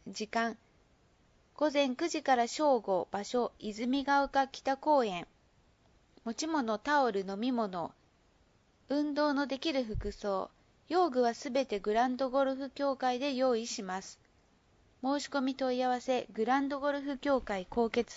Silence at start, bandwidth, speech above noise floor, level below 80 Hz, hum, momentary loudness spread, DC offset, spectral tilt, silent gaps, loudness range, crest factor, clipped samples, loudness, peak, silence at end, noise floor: 0.05 s; 8 kHz; 36 dB; -58 dBFS; none; 9 LU; under 0.1%; -4 dB/octave; none; 4 LU; 16 dB; under 0.1%; -32 LUFS; -16 dBFS; 0 s; -68 dBFS